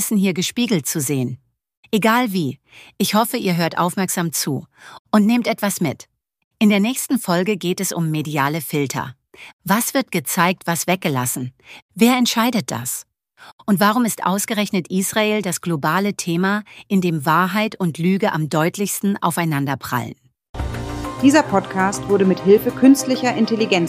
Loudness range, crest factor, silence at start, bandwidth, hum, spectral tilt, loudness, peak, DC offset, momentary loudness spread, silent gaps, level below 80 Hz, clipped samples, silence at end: 2 LU; 18 dB; 0 s; 15.5 kHz; none; -4.5 dB/octave; -19 LUFS; -2 dBFS; under 0.1%; 11 LU; 1.77-1.83 s, 4.99-5.05 s, 6.44-6.51 s, 9.53-9.59 s, 11.82-11.89 s, 13.52-13.58 s, 20.49-20.54 s; -46 dBFS; under 0.1%; 0 s